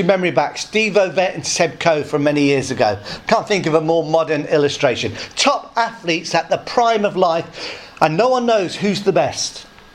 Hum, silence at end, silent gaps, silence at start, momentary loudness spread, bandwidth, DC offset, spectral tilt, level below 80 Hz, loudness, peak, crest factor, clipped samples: none; 0.3 s; none; 0 s; 6 LU; 13 kHz; under 0.1%; -4 dB/octave; -54 dBFS; -17 LUFS; 0 dBFS; 18 dB; under 0.1%